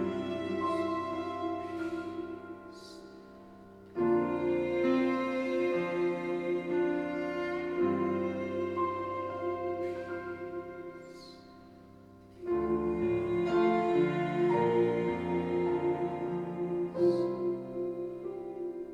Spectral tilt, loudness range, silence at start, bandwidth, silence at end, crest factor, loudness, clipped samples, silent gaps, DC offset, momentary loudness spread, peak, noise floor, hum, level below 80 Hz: -8 dB/octave; 8 LU; 0 s; 7.4 kHz; 0 s; 16 dB; -32 LUFS; under 0.1%; none; under 0.1%; 17 LU; -16 dBFS; -54 dBFS; none; -62 dBFS